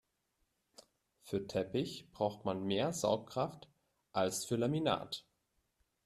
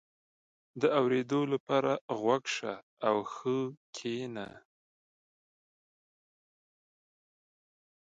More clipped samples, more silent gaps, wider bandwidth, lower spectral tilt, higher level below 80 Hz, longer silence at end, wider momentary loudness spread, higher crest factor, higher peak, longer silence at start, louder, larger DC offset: neither; second, none vs 1.60-1.67 s, 2.01-2.08 s, 2.83-2.97 s, 3.77-3.93 s; first, 14 kHz vs 9.2 kHz; about the same, -5 dB/octave vs -5.5 dB/octave; first, -72 dBFS vs -80 dBFS; second, 0.85 s vs 3.6 s; second, 8 LU vs 12 LU; about the same, 22 dB vs 22 dB; second, -18 dBFS vs -14 dBFS; first, 1.25 s vs 0.75 s; second, -37 LUFS vs -32 LUFS; neither